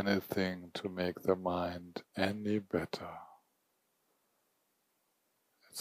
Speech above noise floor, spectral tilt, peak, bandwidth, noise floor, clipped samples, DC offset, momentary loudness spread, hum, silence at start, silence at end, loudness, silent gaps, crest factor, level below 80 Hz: 43 dB; -6 dB/octave; -16 dBFS; 15.5 kHz; -79 dBFS; under 0.1%; under 0.1%; 12 LU; none; 0 s; 0 s; -37 LUFS; none; 22 dB; -70 dBFS